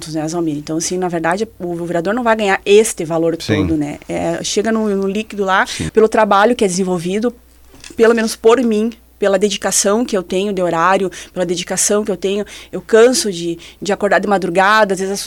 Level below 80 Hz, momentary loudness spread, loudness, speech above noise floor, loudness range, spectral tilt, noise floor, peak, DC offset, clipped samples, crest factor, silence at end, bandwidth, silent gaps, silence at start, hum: -44 dBFS; 10 LU; -15 LUFS; 24 dB; 2 LU; -4 dB/octave; -39 dBFS; 0 dBFS; under 0.1%; under 0.1%; 16 dB; 0 s; 18 kHz; none; 0 s; none